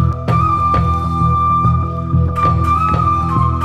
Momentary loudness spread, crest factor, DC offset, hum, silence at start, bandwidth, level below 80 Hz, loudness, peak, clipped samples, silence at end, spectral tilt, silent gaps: 3 LU; 12 dB; under 0.1%; none; 0 s; 8.8 kHz; -24 dBFS; -14 LUFS; -2 dBFS; under 0.1%; 0 s; -8.5 dB/octave; none